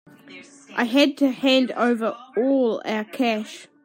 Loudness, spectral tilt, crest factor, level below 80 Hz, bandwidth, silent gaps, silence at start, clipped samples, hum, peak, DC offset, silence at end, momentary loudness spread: -22 LUFS; -4 dB/octave; 16 dB; -78 dBFS; 16 kHz; none; 0.3 s; under 0.1%; none; -6 dBFS; under 0.1%; 0.2 s; 9 LU